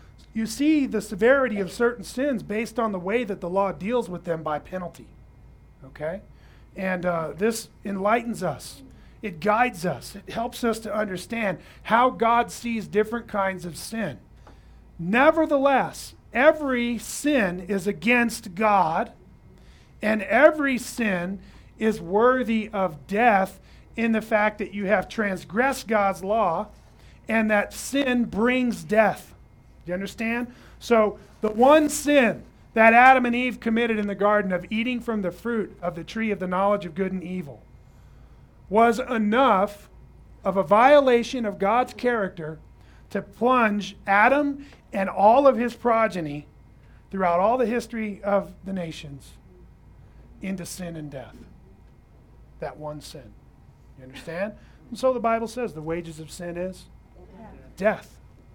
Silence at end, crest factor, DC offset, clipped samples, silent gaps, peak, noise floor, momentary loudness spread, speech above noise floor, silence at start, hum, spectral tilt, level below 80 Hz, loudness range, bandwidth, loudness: 0.5 s; 22 dB; under 0.1%; under 0.1%; none; -2 dBFS; -51 dBFS; 16 LU; 28 dB; 0.35 s; none; -5 dB/octave; -52 dBFS; 11 LU; 19.5 kHz; -23 LUFS